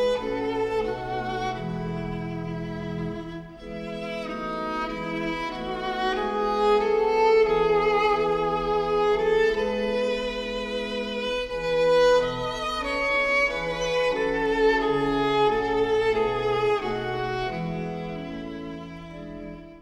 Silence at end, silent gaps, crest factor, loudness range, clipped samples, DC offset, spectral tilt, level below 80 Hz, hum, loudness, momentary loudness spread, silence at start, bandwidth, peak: 0 s; none; 16 dB; 9 LU; under 0.1%; under 0.1%; -5.5 dB/octave; -46 dBFS; none; -25 LUFS; 13 LU; 0 s; 11.5 kHz; -10 dBFS